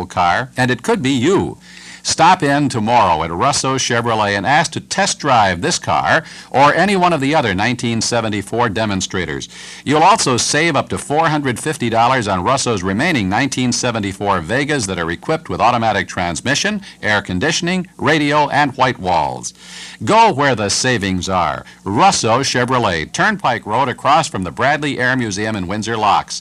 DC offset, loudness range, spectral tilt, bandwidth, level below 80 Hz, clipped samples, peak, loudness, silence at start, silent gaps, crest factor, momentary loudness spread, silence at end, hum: under 0.1%; 2 LU; -4 dB/octave; 13.5 kHz; -46 dBFS; under 0.1%; 0 dBFS; -15 LUFS; 0 s; none; 14 dB; 8 LU; 0 s; none